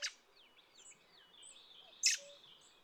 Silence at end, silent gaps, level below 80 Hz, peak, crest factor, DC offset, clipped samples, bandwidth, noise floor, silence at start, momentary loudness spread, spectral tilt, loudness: 0.5 s; none; -90 dBFS; -18 dBFS; 28 dB; under 0.1%; under 0.1%; 19.5 kHz; -67 dBFS; 0 s; 25 LU; 4 dB/octave; -35 LUFS